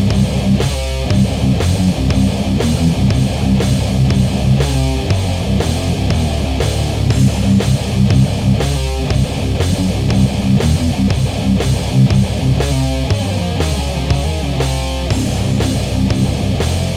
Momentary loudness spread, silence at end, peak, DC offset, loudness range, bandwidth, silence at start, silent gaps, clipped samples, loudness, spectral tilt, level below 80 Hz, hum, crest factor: 4 LU; 0 s; -2 dBFS; under 0.1%; 2 LU; 15.5 kHz; 0 s; none; under 0.1%; -15 LUFS; -6 dB/octave; -22 dBFS; none; 12 dB